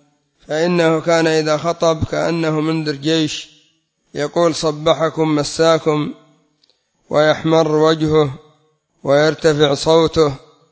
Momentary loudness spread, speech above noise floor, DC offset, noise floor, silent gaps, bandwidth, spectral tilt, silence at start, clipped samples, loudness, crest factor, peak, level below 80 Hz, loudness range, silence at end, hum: 8 LU; 46 dB; under 0.1%; -61 dBFS; none; 8 kHz; -5.5 dB/octave; 0.5 s; under 0.1%; -16 LUFS; 16 dB; 0 dBFS; -46 dBFS; 3 LU; 0.35 s; none